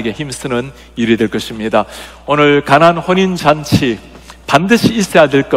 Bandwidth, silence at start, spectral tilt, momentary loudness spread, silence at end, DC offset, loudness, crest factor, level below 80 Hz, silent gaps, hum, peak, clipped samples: 16.5 kHz; 0 s; -5.5 dB/octave; 13 LU; 0 s; 0.2%; -12 LUFS; 12 dB; -40 dBFS; none; none; 0 dBFS; 0.8%